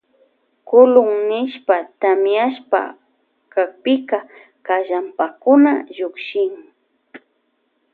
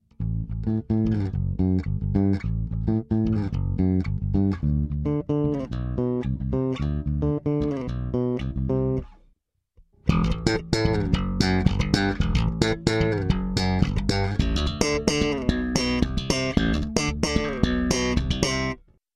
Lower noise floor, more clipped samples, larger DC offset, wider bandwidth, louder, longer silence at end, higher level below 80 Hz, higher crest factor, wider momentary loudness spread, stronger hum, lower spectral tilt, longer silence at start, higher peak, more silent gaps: about the same, -67 dBFS vs -66 dBFS; neither; neither; second, 4.4 kHz vs 12.5 kHz; first, -17 LUFS vs -25 LUFS; first, 0.75 s vs 0.4 s; second, -72 dBFS vs -32 dBFS; about the same, 18 dB vs 20 dB; first, 12 LU vs 5 LU; first, 60 Hz at -60 dBFS vs none; first, -7.5 dB/octave vs -6 dB/octave; first, 0.7 s vs 0.2 s; first, 0 dBFS vs -4 dBFS; neither